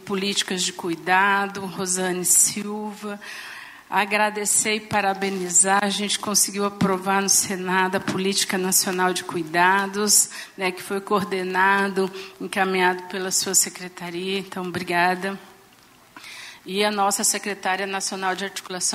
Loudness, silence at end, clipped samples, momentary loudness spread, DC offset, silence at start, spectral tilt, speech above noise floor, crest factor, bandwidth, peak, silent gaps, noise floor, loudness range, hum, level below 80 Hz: -21 LUFS; 0 s; under 0.1%; 14 LU; under 0.1%; 0 s; -2 dB/octave; 30 dB; 18 dB; 16 kHz; -4 dBFS; none; -52 dBFS; 5 LU; none; -68 dBFS